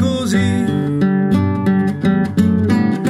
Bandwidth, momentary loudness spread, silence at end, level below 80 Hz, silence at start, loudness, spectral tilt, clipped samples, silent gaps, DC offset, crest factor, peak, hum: 12.5 kHz; 2 LU; 0 s; -50 dBFS; 0 s; -16 LUFS; -7 dB/octave; under 0.1%; none; under 0.1%; 12 dB; -2 dBFS; none